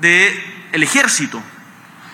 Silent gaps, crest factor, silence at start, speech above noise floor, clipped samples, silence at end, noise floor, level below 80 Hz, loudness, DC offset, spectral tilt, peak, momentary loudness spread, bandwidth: none; 16 dB; 0 s; 26 dB; under 0.1%; 0 s; -40 dBFS; -70 dBFS; -14 LUFS; under 0.1%; -2 dB/octave; 0 dBFS; 15 LU; 18 kHz